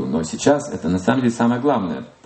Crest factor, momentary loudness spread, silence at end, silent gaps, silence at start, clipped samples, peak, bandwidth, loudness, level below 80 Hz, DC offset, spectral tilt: 18 dB; 5 LU; 0.15 s; none; 0 s; under 0.1%; -2 dBFS; 8.8 kHz; -19 LUFS; -52 dBFS; under 0.1%; -6 dB/octave